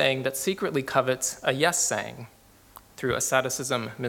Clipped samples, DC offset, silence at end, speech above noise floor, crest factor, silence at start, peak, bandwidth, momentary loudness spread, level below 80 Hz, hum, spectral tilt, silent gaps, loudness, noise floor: under 0.1%; under 0.1%; 0 s; 26 dB; 22 dB; 0 s; -6 dBFS; 18 kHz; 8 LU; -60 dBFS; none; -3 dB/octave; none; -26 LUFS; -52 dBFS